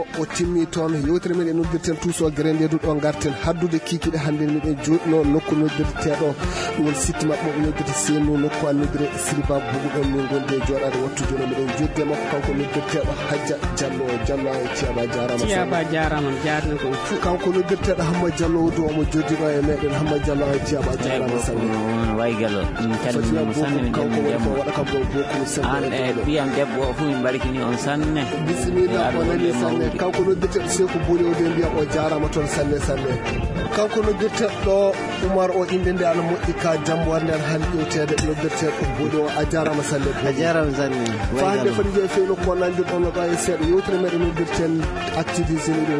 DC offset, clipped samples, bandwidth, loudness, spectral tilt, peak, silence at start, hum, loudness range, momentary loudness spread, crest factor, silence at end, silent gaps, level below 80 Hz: under 0.1%; under 0.1%; 11 kHz; -21 LUFS; -5.5 dB/octave; -6 dBFS; 0 s; none; 2 LU; 4 LU; 14 dB; 0 s; none; -34 dBFS